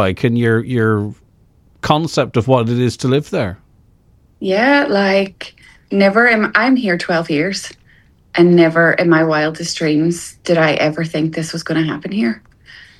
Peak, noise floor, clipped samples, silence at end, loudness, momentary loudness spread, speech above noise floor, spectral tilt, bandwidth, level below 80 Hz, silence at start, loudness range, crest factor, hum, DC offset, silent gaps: 0 dBFS; -51 dBFS; under 0.1%; 0.2 s; -15 LUFS; 11 LU; 37 dB; -6 dB/octave; 12.5 kHz; -50 dBFS; 0 s; 4 LU; 16 dB; none; under 0.1%; none